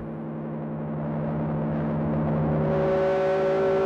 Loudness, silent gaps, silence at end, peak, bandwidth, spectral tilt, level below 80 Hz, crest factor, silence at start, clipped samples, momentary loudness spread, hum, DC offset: -26 LUFS; none; 0 s; -14 dBFS; 6.6 kHz; -9.5 dB/octave; -46 dBFS; 10 dB; 0 s; under 0.1%; 10 LU; none; under 0.1%